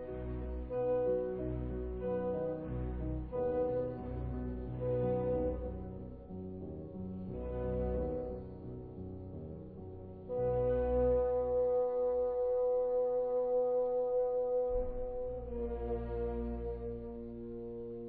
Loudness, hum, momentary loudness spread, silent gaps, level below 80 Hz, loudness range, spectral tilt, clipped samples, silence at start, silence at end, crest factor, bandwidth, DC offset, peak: -36 LUFS; none; 14 LU; none; -46 dBFS; 9 LU; -10 dB/octave; under 0.1%; 0 s; 0 s; 14 dB; 3.4 kHz; under 0.1%; -20 dBFS